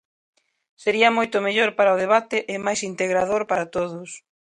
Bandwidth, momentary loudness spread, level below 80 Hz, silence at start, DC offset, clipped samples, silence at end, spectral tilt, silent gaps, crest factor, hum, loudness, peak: 11 kHz; 10 LU; -62 dBFS; 0.8 s; under 0.1%; under 0.1%; 0.25 s; -3.5 dB/octave; none; 20 dB; none; -21 LUFS; -2 dBFS